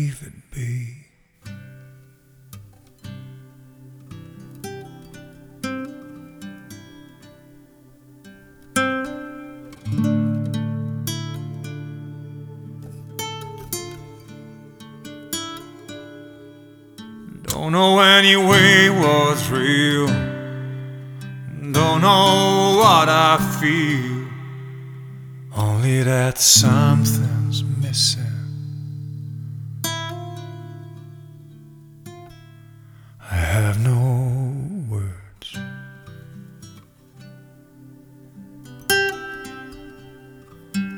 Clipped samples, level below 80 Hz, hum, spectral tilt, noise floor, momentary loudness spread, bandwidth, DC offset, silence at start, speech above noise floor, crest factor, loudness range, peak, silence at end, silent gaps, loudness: under 0.1%; -48 dBFS; none; -4 dB/octave; -50 dBFS; 27 LU; over 20 kHz; under 0.1%; 0 s; 35 dB; 22 dB; 22 LU; 0 dBFS; 0 s; none; -18 LUFS